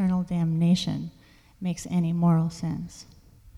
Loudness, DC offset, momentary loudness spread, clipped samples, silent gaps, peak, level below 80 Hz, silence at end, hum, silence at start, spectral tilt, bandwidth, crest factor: -26 LUFS; under 0.1%; 15 LU; under 0.1%; none; -12 dBFS; -54 dBFS; 0 s; none; 0 s; -7 dB/octave; 11.5 kHz; 14 dB